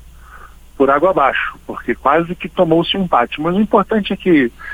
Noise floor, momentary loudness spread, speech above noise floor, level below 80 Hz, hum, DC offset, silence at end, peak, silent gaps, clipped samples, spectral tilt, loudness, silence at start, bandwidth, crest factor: -38 dBFS; 8 LU; 23 dB; -42 dBFS; none; under 0.1%; 0 s; 0 dBFS; none; under 0.1%; -7 dB/octave; -15 LUFS; 0.3 s; 16 kHz; 16 dB